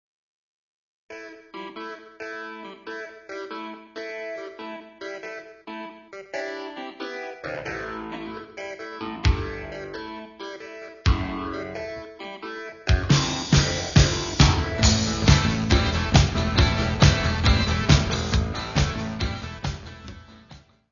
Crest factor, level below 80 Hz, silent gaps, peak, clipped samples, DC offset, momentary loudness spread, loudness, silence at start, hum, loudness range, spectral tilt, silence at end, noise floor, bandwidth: 24 dB; -30 dBFS; none; 0 dBFS; under 0.1%; under 0.1%; 18 LU; -24 LUFS; 1.1 s; none; 16 LU; -4.5 dB/octave; 0.35 s; -50 dBFS; 7.4 kHz